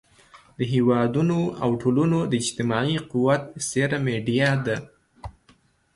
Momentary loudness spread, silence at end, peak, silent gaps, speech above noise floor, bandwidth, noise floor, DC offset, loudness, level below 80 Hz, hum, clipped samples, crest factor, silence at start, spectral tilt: 10 LU; 0.65 s; -8 dBFS; none; 37 dB; 11.5 kHz; -60 dBFS; under 0.1%; -23 LUFS; -54 dBFS; none; under 0.1%; 16 dB; 0.35 s; -5.5 dB/octave